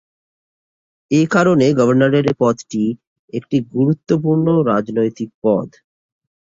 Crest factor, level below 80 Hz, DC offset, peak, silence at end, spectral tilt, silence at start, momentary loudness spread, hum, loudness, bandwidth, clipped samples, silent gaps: 16 dB; -56 dBFS; under 0.1%; -2 dBFS; 0.9 s; -7.5 dB/octave; 1.1 s; 8 LU; none; -16 LUFS; 7.8 kHz; under 0.1%; 3.07-3.28 s, 5.34-5.42 s